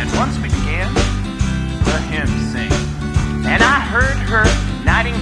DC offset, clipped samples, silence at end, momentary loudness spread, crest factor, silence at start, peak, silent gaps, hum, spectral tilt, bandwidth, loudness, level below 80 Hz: under 0.1%; under 0.1%; 0 s; 7 LU; 16 dB; 0 s; 0 dBFS; none; none; -5 dB/octave; 11 kHz; -17 LUFS; -22 dBFS